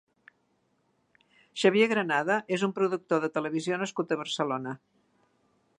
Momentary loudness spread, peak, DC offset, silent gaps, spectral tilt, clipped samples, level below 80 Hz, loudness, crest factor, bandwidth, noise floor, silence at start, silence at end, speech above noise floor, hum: 9 LU; -8 dBFS; under 0.1%; none; -5 dB/octave; under 0.1%; -82 dBFS; -28 LUFS; 22 dB; 11 kHz; -72 dBFS; 1.55 s; 1.05 s; 44 dB; none